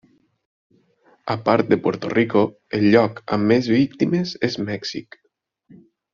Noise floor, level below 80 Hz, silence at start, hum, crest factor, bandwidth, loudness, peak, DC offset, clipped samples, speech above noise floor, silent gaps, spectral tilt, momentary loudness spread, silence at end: -58 dBFS; -58 dBFS; 1.25 s; none; 20 dB; 7.2 kHz; -20 LUFS; -2 dBFS; under 0.1%; under 0.1%; 39 dB; none; -5.5 dB/octave; 11 LU; 1.1 s